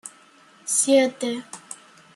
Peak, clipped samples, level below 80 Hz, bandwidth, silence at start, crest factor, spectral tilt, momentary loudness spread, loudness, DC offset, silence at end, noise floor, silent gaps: -6 dBFS; under 0.1%; -74 dBFS; 13 kHz; 0.05 s; 18 dB; -1.5 dB/octave; 23 LU; -21 LUFS; under 0.1%; 0.4 s; -53 dBFS; none